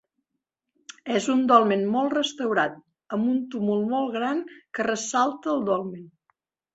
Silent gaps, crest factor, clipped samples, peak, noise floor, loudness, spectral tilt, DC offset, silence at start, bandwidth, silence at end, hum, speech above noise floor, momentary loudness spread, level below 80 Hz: none; 22 dB; under 0.1%; -4 dBFS; -82 dBFS; -24 LUFS; -4.5 dB/octave; under 0.1%; 1.05 s; 8.2 kHz; 0.65 s; none; 58 dB; 12 LU; -70 dBFS